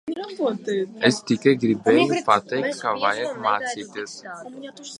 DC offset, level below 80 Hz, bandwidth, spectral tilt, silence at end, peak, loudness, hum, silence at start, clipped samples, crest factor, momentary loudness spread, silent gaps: under 0.1%; -68 dBFS; 11.5 kHz; -4.5 dB/octave; 0.05 s; -2 dBFS; -22 LUFS; none; 0.05 s; under 0.1%; 20 dB; 16 LU; none